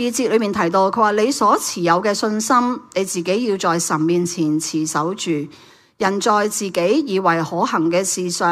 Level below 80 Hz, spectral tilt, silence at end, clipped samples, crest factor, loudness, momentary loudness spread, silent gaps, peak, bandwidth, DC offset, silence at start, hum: -62 dBFS; -4 dB/octave; 0 s; under 0.1%; 16 dB; -18 LUFS; 5 LU; none; -2 dBFS; 15.5 kHz; under 0.1%; 0 s; none